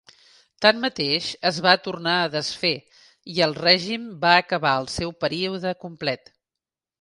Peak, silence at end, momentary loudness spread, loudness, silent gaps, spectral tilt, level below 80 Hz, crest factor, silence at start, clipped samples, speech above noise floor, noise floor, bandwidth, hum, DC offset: 0 dBFS; 0.85 s; 11 LU; -22 LUFS; none; -4 dB/octave; -56 dBFS; 22 dB; 0.6 s; under 0.1%; 66 dB; -88 dBFS; 11.5 kHz; none; under 0.1%